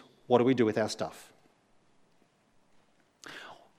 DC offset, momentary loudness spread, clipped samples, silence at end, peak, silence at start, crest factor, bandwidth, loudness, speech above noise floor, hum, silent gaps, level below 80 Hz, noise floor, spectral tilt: under 0.1%; 23 LU; under 0.1%; 0.25 s; -8 dBFS; 0.3 s; 24 dB; 14.5 kHz; -28 LUFS; 40 dB; none; none; -76 dBFS; -68 dBFS; -6 dB/octave